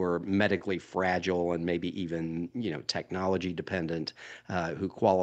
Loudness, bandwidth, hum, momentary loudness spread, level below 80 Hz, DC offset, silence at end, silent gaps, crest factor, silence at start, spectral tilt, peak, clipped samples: -31 LUFS; 8.8 kHz; none; 7 LU; -62 dBFS; under 0.1%; 0 s; none; 20 dB; 0 s; -6 dB/octave; -10 dBFS; under 0.1%